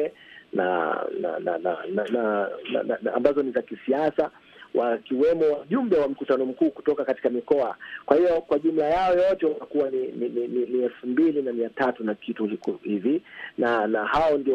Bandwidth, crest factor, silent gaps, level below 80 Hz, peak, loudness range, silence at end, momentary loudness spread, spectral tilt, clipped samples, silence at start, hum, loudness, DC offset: 7.4 kHz; 20 dB; none; -58 dBFS; -4 dBFS; 3 LU; 0 s; 7 LU; -7.5 dB/octave; under 0.1%; 0 s; none; -25 LUFS; under 0.1%